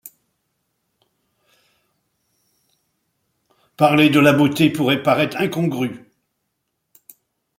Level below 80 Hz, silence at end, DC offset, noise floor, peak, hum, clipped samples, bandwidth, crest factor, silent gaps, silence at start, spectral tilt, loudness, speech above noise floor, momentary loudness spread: -62 dBFS; 1.6 s; under 0.1%; -75 dBFS; -2 dBFS; none; under 0.1%; 16.5 kHz; 20 dB; none; 0.05 s; -6 dB/octave; -17 LUFS; 59 dB; 11 LU